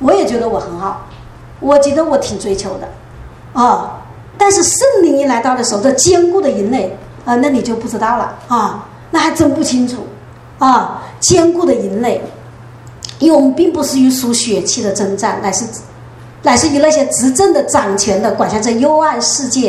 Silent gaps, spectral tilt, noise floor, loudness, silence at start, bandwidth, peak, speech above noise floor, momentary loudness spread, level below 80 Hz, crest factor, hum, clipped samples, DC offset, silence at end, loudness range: none; -3.5 dB/octave; -34 dBFS; -12 LUFS; 0 s; 15 kHz; 0 dBFS; 22 dB; 13 LU; -42 dBFS; 12 dB; none; under 0.1%; under 0.1%; 0 s; 4 LU